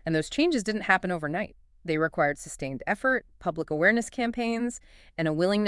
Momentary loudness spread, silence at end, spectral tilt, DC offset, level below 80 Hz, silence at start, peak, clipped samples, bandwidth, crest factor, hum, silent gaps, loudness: 11 LU; 0 s; -5 dB/octave; under 0.1%; -54 dBFS; 0.05 s; -6 dBFS; under 0.1%; 12 kHz; 22 dB; none; none; -27 LUFS